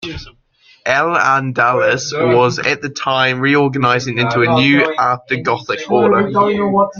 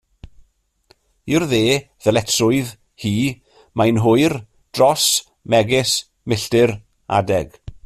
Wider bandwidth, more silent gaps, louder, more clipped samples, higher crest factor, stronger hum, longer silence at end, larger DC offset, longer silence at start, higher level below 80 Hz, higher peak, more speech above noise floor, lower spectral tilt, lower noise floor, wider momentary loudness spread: second, 7.2 kHz vs 14 kHz; neither; first, -14 LUFS vs -18 LUFS; neither; about the same, 14 dB vs 16 dB; neither; second, 0 s vs 0.15 s; neither; second, 0 s vs 1.25 s; about the same, -50 dBFS vs -48 dBFS; about the same, 0 dBFS vs -2 dBFS; second, 37 dB vs 42 dB; about the same, -5 dB/octave vs -4.5 dB/octave; second, -51 dBFS vs -59 dBFS; second, 6 LU vs 15 LU